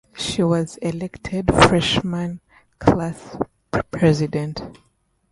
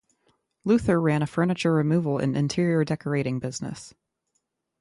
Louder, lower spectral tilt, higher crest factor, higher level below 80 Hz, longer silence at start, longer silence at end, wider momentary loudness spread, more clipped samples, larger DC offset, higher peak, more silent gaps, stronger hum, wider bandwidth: first, -20 LUFS vs -25 LUFS; second, -5.5 dB/octave vs -7 dB/octave; about the same, 20 dB vs 16 dB; first, -40 dBFS vs -54 dBFS; second, 0.15 s vs 0.65 s; second, 0.6 s vs 0.9 s; first, 15 LU vs 11 LU; neither; neither; first, 0 dBFS vs -10 dBFS; neither; neither; about the same, 11.5 kHz vs 11.5 kHz